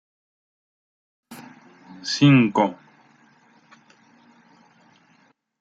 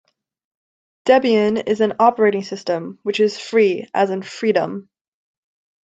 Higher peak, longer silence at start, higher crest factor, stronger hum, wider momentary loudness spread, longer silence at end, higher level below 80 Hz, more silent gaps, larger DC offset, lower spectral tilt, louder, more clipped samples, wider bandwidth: about the same, -4 dBFS vs -2 dBFS; first, 1.3 s vs 1.05 s; about the same, 22 dB vs 18 dB; neither; first, 28 LU vs 10 LU; first, 2.85 s vs 1.05 s; about the same, -70 dBFS vs -66 dBFS; neither; neither; about the same, -6 dB/octave vs -5.5 dB/octave; about the same, -19 LUFS vs -18 LUFS; neither; first, 11.5 kHz vs 8 kHz